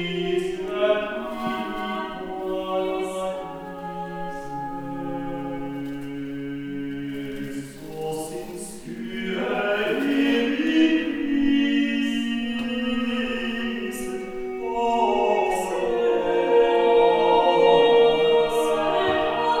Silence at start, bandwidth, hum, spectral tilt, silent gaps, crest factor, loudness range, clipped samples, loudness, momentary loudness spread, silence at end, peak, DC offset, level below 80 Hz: 0 s; 15 kHz; none; -5 dB/octave; none; 18 dB; 13 LU; under 0.1%; -23 LUFS; 15 LU; 0 s; -6 dBFS; under 0.1%; -50 dBFS